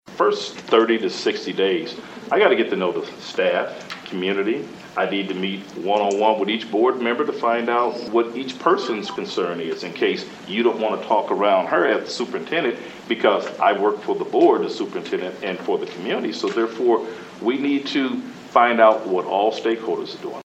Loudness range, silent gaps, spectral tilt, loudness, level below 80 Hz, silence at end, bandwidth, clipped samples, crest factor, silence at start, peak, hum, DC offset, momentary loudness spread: 3 LU; none; -5 dB/octave; -21 LUFS; -70 dBFS; 0 s; 8.6 kHz; under 0.1%; 20 dB; 0.05 s; 0 dBFS; none; under 0.1%; 10 LU